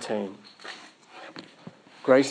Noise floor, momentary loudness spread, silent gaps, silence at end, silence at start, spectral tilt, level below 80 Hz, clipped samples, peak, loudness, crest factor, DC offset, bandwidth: -49 dBFS; 26 LU; none; 0 s; 0 s; -4.5 dB/octave; -86 dBFS; under 0.1%; -8 dBFS; -26 LUFS; 22 dB; under 0.1%; 10 kHz